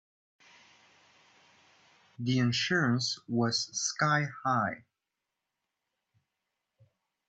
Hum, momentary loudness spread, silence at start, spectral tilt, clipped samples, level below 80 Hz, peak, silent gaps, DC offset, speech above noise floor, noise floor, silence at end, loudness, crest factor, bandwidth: none; 5 LU; 2.2 s; -4 dB/octave; under 0.1%; -72 dBFS; -14 dBFS; none; under 0.1%; 57 dB; -87 dBFS; 2.5 s; -30 LUFS; 20 dB; 9 kHz